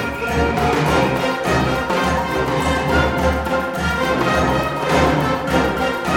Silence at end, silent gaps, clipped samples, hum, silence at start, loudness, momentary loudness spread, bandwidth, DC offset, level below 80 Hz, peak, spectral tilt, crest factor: 0 s; none; under 0.1%; none; 0 s; -18 LUFS; 3 LU; 17.5 kHz; under 0.1%; -30 dBFS; -4 dBFS; -5.5 dB/octave; 14 dB